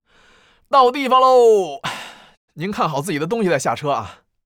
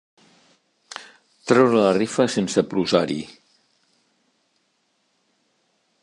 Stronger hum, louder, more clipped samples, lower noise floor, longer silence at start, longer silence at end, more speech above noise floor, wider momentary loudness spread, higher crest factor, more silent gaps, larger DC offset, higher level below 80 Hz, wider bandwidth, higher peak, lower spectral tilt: neither; first, -17 LUFS vs -20 LUFS; neither; second, -53 dBFS vs -69 dBFS; second, 0.7 s vs 0.95 s; second, 0.3 s vs 2.75 s; second, 37 dB vs 50 dB; second, 16 LU vs 22 LU; second, 16 dB vs 22 dB; first, 2.37-2.48 s vs none; neither; about the same, -60 dBFS vs -64 dBFS; first, 17 kHz vs 11.5 kHz; about the same, -2 dBFS vs -2 dBFS; about the same, -5 dB/octave vs -5 dB/octave